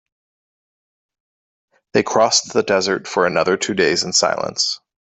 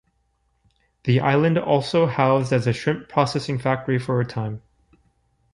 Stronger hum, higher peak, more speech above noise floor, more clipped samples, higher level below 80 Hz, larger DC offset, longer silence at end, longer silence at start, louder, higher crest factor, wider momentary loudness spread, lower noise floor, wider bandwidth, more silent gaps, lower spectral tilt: neither; about the same, -2 dBFS vs -4 dBFS; first, over 72 dB vs 47 dB; neither; about the same, -60 dBFS vs -56 dBFS; neither; second, 0.3 s vs 0.95 s; first, 1.95 s vs 1.05 s; first, -17 LUFS vs -21 LUFS; about the same, 18 dB vs 18 dB; second, 5 LU vs 9 LU; first, under -90 dBFS vs -68 dBFS; second, 8.4 kHz vs 11 kHz; neither; second, -2.5 dB/octave vs -7 dB/octave